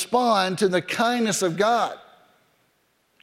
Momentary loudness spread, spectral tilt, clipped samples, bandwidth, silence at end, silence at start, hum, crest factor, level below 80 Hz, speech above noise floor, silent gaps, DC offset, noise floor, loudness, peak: 4 LU; -3.5 dB/octave; under 0.1%; 16 kHz; 1.2 s; 0 s; none; 16 dB; -70 dBFS; 45 dB; none; under 0.1%; -67 dBFS; -22 LUFS; -8 dBFS